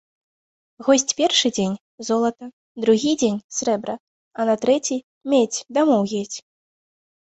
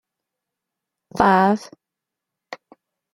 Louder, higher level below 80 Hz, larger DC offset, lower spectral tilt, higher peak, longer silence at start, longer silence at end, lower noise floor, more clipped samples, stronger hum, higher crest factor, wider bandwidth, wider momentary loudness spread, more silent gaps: second, -21 LUFS vs -18 LUFS; second, -64 dBFS vs -54 dBFS; neither; second, -3.5 dB/octave vs -6.5 dB/octave; about the same, -4 dBFS vs -2 dBFS; second, 0.8 s vs 1.15 s; first, 0.8 s vs 0.6 s; first, under -90 dBFS vs -85 dBFS; neither; neither; about the same, 18 dB vs 22 dB; second, 8.4 kHz vs 13 kHz; second, 14 LU vs 24 LU; first, 1.80-1.98 s, 2.53-2.75 s, 3.44-3.49 s, 4.00-4.31 s, 5.04-5.21 s vs none